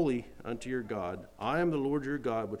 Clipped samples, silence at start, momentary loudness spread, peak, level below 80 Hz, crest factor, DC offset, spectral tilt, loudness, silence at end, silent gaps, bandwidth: under 0.1%; 0 s; 9 LU; -18 dBFS; -58 dBFS; 14 dB; under 0.1%; -7 dB/octave; -34 LUFS; 0 s; none; 14 kHz